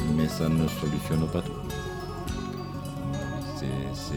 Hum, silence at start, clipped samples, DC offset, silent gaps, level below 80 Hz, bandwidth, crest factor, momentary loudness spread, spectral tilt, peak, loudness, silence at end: none; 0 s; under 0.1%; under 0.1%; none; -42 dBFS; 18 kHz; 16 dB; 9 LU; -6.5 dB/octave; -12 dBFS; -30 LUFS; 0 s